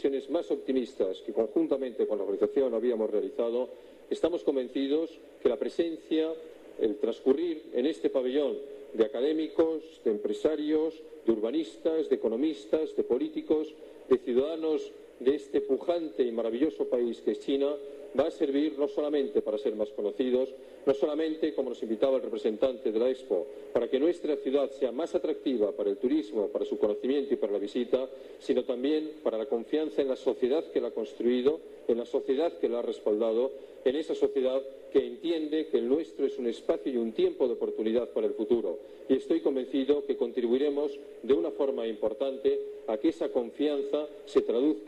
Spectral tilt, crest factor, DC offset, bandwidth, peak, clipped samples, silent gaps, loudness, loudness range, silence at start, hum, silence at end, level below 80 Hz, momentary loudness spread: -6 dB/octave; 18 dB; under 0.1%; 10.5 kHz; -12 dBFS; under 0.1%; none; -30 LUFS; 1 LU; 0 s; none; 0 s; -68 dBFS; 5 LU